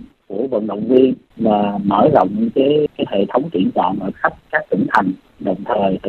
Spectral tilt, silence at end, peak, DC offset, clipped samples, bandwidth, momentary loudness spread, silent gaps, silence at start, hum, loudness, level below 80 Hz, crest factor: -8.5 dB/octave; 0 s; 0 dBFS; under 0.1%; under 0.1%; 6.8 kHz; 9 LU; none; 0 s; none; -17 LUFS; -52 dBFS; 16 dB